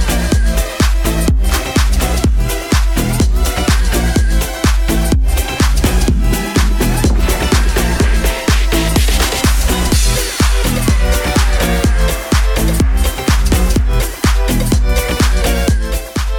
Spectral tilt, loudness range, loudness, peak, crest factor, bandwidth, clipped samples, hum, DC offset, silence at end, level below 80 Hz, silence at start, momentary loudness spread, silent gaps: -4.5 dB/octave; 1 LU; -14 LUFS; -2 dBFS; 10 dB; 18 kHz; under 0.1%; none; under 0.1%; 0 s; -14 dBFS; 0 s; 2 LU; none